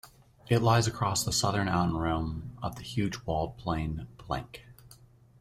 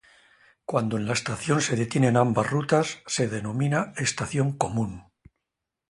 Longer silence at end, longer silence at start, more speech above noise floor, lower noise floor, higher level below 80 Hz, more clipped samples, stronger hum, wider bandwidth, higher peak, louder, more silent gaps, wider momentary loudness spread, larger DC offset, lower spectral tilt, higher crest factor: second, 0.45 s vs 0.9 s; second, 0.05 s vs 0.7 s; second, 27 dB vs 60 dB; second, -56 dBFS vs -85 dBFS; first, -48 dBFS vs -56 dBFS; neither; neither; first, 15.5 kHz vs 11.5 kHz; second, -10 dBFS vs -6 dBFS; second, -30 LUFS vs -25 LUFS; neither; first, 12 LU vs 6 LU; neither; about the same, -5 dB/octave vs -5 dB/octave; about the same, 22 dB vs 20 dB